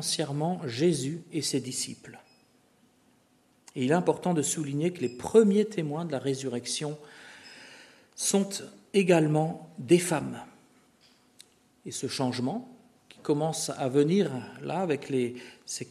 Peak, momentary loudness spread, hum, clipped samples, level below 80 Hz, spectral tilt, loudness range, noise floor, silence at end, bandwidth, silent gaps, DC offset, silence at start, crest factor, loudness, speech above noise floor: -8 dBFS; 20 LU; none; under 0.1%; -72 dBFS; -5 dB/octave; 6 LU; -65 dBFS; 0.05 s; 13.5 kHz; none; under 0.1%; 0 s; 22 dB; -28 LUFS; 37 dB